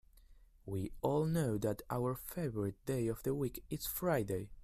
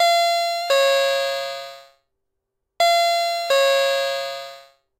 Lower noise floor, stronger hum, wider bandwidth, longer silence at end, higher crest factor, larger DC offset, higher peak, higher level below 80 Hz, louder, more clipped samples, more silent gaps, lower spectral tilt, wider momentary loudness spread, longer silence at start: second, -62 dBFS vs -78 dBFS; neither; about the same, 16 kHz vs 16 kHz; second, 0 s vs 0.4 s; about the same, 18 dB vs 14 dB; neither; second, -20 dBFS vs -6 dBFS; first, -58 dBFS vs -74 dBFS; second, -38 LUFS vs -19 LUFS; neither; neither; first, -6.5 dB/octave vs 2 dB/octave; second, 7 LU vs 15 LU; first, 0.15 s vs 0 s